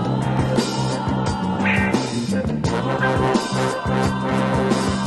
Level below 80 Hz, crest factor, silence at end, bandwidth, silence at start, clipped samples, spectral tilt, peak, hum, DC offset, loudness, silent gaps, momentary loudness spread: -38 dBFS; 14 dB; 0 s; 12 kHz; 0 s; under 0.1%; -6 dB/octave; -6 dBFS; none; under 0.1%; -20 LUFS; none; 4 LU